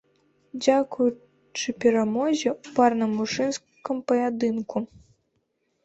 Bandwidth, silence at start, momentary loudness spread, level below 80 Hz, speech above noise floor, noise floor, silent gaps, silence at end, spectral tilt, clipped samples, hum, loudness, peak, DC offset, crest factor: 8.2 kHz; 0.55 s; 11 LU; -66 dBFS; 49 dB; -73 dBFS; none; 1 s; -4.5 dB/octave; under 0.1%; none; -25 LUFS; -6 dBFS; under 0.1%; 20 dB